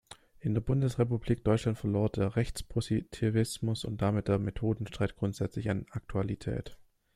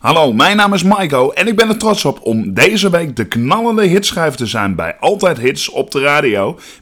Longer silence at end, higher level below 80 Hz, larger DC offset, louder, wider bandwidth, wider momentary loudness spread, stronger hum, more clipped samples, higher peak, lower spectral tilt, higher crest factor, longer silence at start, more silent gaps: first, 0.4 s vs 0.1 s; about the same, -50 dBFS vs -46 dBFS; neither; second, -32 LUFS vs -13 LUFS; second, 14 kHz vs over 20 kHz; about the same, 7 LU vs 7 LU; neither; neither; second, -12 dBFS vs -2 dBFS; first, -7 dB/octave vs -4.5 dB/octave; first, 20 dB vs 12 dB; about the same, 0.1 s vs 0.05 s; neither